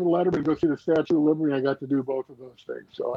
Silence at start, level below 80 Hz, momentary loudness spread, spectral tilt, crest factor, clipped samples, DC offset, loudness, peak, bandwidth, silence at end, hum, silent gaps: 0 s; -62 dBFS; 16 LU; -8.5 dB/octave; 14 dB; under 0.1%; under 0.1%; -25 LUFS; -10 dBFS; 6.8 kHz; 0 s; none; none